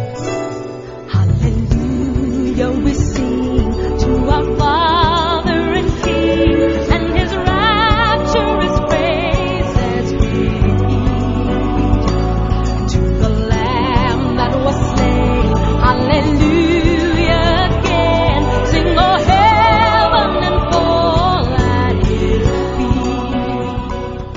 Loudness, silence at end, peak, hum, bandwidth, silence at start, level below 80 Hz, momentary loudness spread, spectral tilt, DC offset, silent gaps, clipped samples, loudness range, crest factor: -14 LUFS; 0 s; 0 dBFS; none; 7.6 kHz; 0 s; -20 dBFS; 5 LU; -6.5 dB/octave; under 0.1%; none; under 0.1%; 4 LU; 14 dB